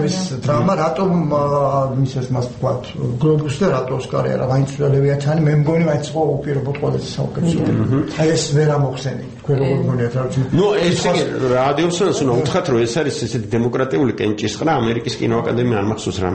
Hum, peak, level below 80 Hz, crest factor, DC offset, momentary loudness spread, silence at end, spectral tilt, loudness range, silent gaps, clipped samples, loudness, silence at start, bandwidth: none; -4 dBFS; -44 dBFS; 14 dB; under 0.1%; 5 LU; 0 s; -6.5 dB/octave; 2 LU; none; under 0.1%; -18 LUFS; 0 s; 8.8 kHz